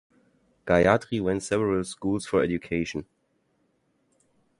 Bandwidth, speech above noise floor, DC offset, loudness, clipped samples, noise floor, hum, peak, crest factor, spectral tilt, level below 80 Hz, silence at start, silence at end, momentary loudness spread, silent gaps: 11.5 kHz; 46 dB; under 0.1%; -25 LUFS; under 0.1%; -71 dBFS; none; -4 dBFS; 24 dB; -6 dB/octave; -50 dBFS; 0.65 s; 1.55 s; 10 LU; none